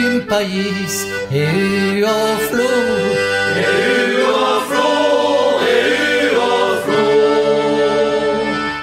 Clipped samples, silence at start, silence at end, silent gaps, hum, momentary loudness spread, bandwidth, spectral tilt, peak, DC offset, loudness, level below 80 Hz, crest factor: under 0.1%; 0 s; 0 s; none; none; 4 LU; 16 kHz; -4 dB/octave; -2 dBFS; under 0.1%; -15 LUFS; -50 dBFS; 12 dB